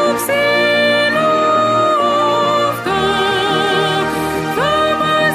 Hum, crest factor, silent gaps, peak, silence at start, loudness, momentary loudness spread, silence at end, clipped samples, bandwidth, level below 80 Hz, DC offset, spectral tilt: none; 12 dB; none; -2 dBFS; 0 s; -14 LUFS; 4 LU; 0 s; under 0.1%; 15.5 kHz; -46 dBFS; under 0.1%; -4 dB/octave